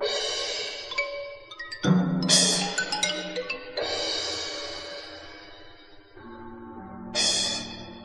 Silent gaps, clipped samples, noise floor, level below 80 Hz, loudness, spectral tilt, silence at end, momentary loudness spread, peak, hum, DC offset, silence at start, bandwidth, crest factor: none; under 0.1%; -49 dBFS; -58 dBFS; -25 LUFS; -2.5 dB/octave; 0 s; 21 LU; -6 dBFS; none; under 0.1%; 0 s; 11.5 kHz; 22 dB